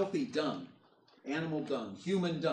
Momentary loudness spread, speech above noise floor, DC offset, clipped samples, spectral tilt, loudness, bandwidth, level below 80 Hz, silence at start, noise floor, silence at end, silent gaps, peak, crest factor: 12 LU; 30 dB; under 0.1%; under 0.1%; -6.5 dB/octave; -36 LUFS; 9.8 kHz; -76 dBFS; 0 s; -65 dBFS; 0 s; none; -20 dBFS; 16 dB